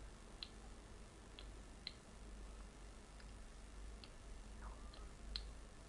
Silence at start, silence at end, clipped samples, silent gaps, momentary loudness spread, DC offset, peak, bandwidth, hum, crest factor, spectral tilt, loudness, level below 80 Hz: 0 s; 0 s; under 0.1%; none; 9 LU; under 0.1%; -28 dBFS; 11.5 kHz; none; 26 dB; -3.5 dB/octave; -56 LUFS; -56 dBFS